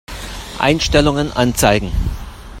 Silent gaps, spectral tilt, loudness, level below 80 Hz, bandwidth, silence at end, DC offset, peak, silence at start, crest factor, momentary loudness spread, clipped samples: none; -4.5 dB/octave; -16 LUFS; -26 dBFS; 16.5 kHz; 0 s; under 0.1%; 0 dBFS; 0.1 s; 16 dB; 16 LU; under 0.1%